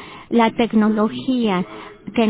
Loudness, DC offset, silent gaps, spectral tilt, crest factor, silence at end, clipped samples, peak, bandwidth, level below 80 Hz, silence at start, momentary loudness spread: -19 LUFS; under 0.1%; none; -10.5 dB/octave; 16 dB; 0 s; under 0.1%; -4 dBFS; 4 kHz; -54 dBFS; 0 s; 10 LU